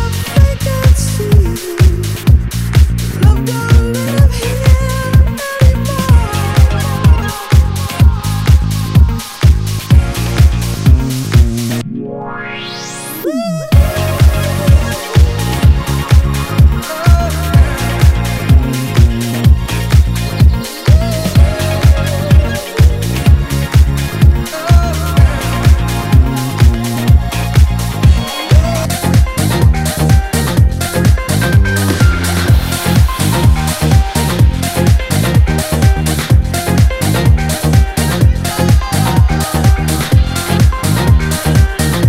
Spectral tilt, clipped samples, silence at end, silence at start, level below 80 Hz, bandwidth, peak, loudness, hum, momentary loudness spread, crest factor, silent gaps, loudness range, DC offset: -5.5 dB/octave; 2%; 0 s; 0 s; -14 dBFS; 16.5 kHz; 0 dBFS; -12 LUFS; none; 3 LU; 10 dB; none; 1 LU; under 0.1%